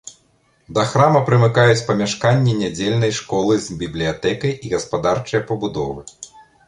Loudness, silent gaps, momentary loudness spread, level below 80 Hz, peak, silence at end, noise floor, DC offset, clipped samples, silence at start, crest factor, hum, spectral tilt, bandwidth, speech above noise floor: -18 LUFS; none; 12 LU; -48 dBFS; -2 dBFS; 0.25 s; -59 dBFS; under 0.1%; under 0.1%; 0.05 s; 16 dB; none; -5.5 dB/octave; 11 kHz; 42 dB